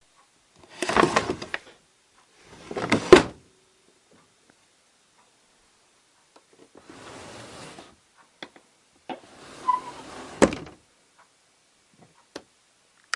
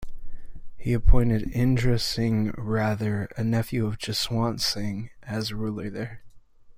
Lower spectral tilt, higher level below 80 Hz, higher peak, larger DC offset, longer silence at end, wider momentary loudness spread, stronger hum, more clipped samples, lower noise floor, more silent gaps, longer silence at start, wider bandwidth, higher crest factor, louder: second, -4.5 dB/octave vs -6 dB/octave; second, -54 dBFS vs -32 dBFS; first, 0 dBFS vs -4 dBFS; neither; first, 0.75 s vs 0.05 s; first, 30 LU vs 10 LU; neither; neither; first, -63 dBFS vs -48 dBFS; neither; first, 0.8 s vs 0 s; second, 11.5 kHz vs 15.5 kHz; first, 28 dB vs 20 dB; first, -23 LUFS vs -26 LUFS